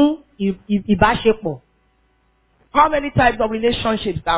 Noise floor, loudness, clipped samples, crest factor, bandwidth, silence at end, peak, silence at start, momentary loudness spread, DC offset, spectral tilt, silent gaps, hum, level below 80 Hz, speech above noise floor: -61 dBFS; -18 LUFS; under 0.1%; 18 dB; 4 kHz; 0 s; -2 dBFS; 0 s; 8 LU; under 0.1%; -10 dB/octave; none; none; -40 dBFS; 43 dB